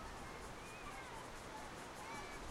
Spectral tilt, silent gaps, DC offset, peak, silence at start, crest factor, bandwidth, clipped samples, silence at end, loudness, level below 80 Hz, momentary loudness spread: -3.5 dB/octave; none; under 0.1%; -36 dBFS; 0 s; 14 dB; 16 kHz; under 0.1%; 0 s; -50 LUFS; -60 dBFS; 2 LU